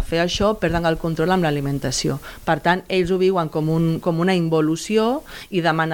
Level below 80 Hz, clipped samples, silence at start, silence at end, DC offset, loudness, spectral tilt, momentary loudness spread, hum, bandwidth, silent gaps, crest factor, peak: -40 dBFS; under 0.1%; 0 s; 0 s; under 0.1%; -20 LUFS; -5.5 dB/octave; 4 LU; none; 18.5 kHz; none; 16 dB; -4 dBFS